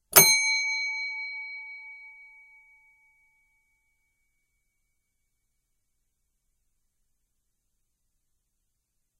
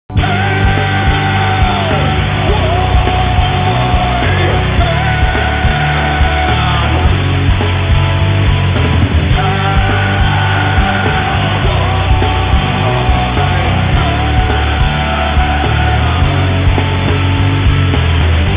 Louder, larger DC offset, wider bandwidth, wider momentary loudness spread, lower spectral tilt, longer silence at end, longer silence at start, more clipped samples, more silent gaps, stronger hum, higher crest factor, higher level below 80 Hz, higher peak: second, -22 LUFS vs -12 LUFS; neither; first, 15.5 kHz vs 4 kHz; first, 26 LU vs 1 LU; second, 0 dB/octave vs -10 dB/octave; first, 7.1 s vs 0 s; about the same, 0.1 s vs 0.1 s; neither; neither; neither; first, 30 dB vs 10 dB; second, -68 dBFS vs -16 dBFS; about the same, -2 dBFS vs 0 dBFS